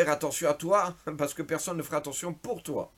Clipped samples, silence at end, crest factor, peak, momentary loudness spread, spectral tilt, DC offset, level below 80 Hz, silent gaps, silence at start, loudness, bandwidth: under 0.1%; 0.1 s; 18 dB; -12 dBFS; 9 LU; -4 dB/octave; under 0.1%; -64 dBFS; none; 0 s; -30 LUFS; 17 kHz